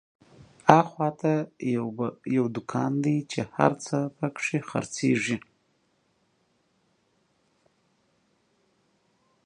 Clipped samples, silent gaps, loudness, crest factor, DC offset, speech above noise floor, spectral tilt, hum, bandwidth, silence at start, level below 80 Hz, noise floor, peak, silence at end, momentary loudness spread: under 0.1%; none; -26 LUFS; 28 dB; under 0.1%; 44 dB; -6 dB/octave; none; 11 kHz; 0.65 s; -68 dBFS; -70 dBFS; 0 dBFS; 4.05 s; 11 LU